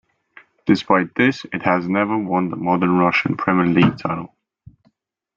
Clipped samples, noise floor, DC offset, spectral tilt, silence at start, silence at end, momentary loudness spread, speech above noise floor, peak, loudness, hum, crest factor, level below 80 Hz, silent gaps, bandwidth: under 0.1%; -64 dBFS; under 0.1%; -7.5 dB/octave; 0.65 s; 1.1 s; 10 LU; 46 dB; -2 dBFS; -18 LUFS; none; 18 dB; -58 dBFS; none; 7.2 kHz